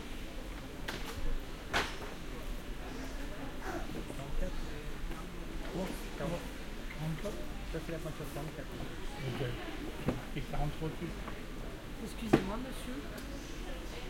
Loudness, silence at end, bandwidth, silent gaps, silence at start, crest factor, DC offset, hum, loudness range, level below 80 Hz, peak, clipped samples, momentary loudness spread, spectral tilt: -41 LUFS; 0 s; 16.5 kHz; none; 0 s; 30 dB; under 0.1%; none; 4 LU; -42 dBFS; -8 dBFS; under 0.1%; 9 LU; -5.5 dB/octave